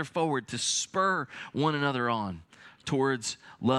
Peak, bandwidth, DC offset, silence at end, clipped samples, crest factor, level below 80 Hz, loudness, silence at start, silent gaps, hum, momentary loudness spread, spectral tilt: -12 dBFS; 13 kHz; under 0.1%; 0 s; under 0.1%; 18 dB; -70 dBFS; -29 LUFS; 0 s; none; none; 9 LU; -4 dB/octave